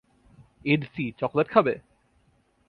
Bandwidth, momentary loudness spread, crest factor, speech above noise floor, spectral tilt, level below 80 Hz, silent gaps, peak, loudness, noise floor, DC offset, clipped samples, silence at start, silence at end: 5.2 kHz; 12 LU; 24 dB; 41 dB; -9 dB/octave; -62 dBFS; none; -4 dBFS; -26 LUFS; -66 dBFS; under 0.1%; under 0.1%; 0.65 s; 0.9 s